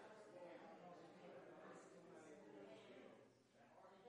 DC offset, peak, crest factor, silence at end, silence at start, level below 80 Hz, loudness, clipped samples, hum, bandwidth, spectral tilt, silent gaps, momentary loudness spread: under 0.1%; -48 dBFS; 14 dB; 0 s; 0 s; under -90 dBFS; -63 LUFS; under 0.1%; none; 10 kHz; -5 dB/octave; none; 5 LU